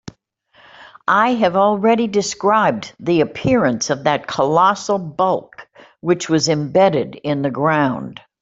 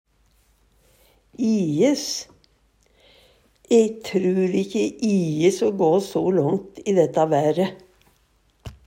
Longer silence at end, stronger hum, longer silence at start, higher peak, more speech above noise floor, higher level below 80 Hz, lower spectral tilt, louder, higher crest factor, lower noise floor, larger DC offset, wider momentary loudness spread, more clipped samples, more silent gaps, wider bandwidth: first, 0.3 s vs 0.15 s; neither; second, 0.8 s vs 1.4 s; first, -2 dBFS vs -6 dBFS; second, 38 dB vs 42 dB; about the same, -54 dBFS vs -58 dBFS; about the same, -5 dB/octave vs -6 dB/octave; first, -17 LUFS vs -21 LUFS; about the same, 16 dB vs 18 dB; second, -55 dBFS vs -62 dBFS; neither; about the same, 7 LU vs 7 LU; neither; neither; second, 8 kHz vs 16 kHz